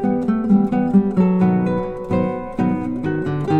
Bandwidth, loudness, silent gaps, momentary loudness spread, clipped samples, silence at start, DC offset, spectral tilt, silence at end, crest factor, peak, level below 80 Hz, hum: 4.3 kHz; -19 LUFS; none; 7 LU; under 0.1%; 0 s; under 0.1%; -10 dB/octave; 0 s; 14 dB; -4 dBFS; -42 dBFS; none